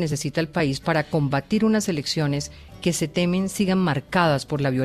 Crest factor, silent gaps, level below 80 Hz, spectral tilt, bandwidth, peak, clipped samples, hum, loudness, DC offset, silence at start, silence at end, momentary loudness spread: 16 dB; none; -50 dBFS; -5.5 dB/octave; 14.5 kHz; -6 dBFS; under 0.1%; none; -23 LUFS; under 0.1%; 0 s; 0 s; 5 LU